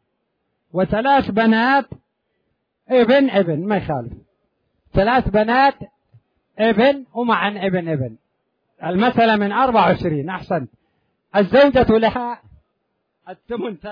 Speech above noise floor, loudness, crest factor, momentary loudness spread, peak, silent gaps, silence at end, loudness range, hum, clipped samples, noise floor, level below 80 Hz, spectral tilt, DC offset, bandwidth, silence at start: 55 dB; -17 LUFS; 16 dB; 13 LU; -4 dBFS; none; 0 s; 3 LU; none; under 0.1%; -72 dBFS; -42 dBFS; -8.5 dB/octave; under 0.1%; 5.2 kHz; 0.75 s